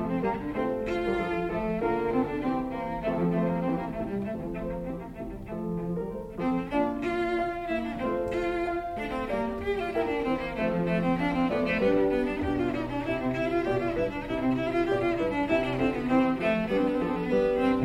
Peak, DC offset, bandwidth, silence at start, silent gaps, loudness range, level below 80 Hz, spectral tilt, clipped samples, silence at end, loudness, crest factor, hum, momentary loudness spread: -12 dBFS; under 0.1%; 13.5 kHz; 0 s; none; 4 LU; -46 dBFS; -7.5 dB/octave; under 0.1%; 0 s; -29 LUFS; 16 dB; none; 7 LU